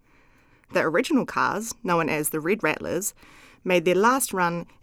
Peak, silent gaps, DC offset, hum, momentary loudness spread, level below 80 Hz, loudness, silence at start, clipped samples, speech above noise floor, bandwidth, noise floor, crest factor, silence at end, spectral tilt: -8 dBFS; none; under 0.1%; none; 9 LU; -58 dBFS; -24 LUFS; 0.7 s; under 0.1%; 34 dB; 19 kHz; -58 dBFS; 16 dB; 0.2 s; -4 dB/octave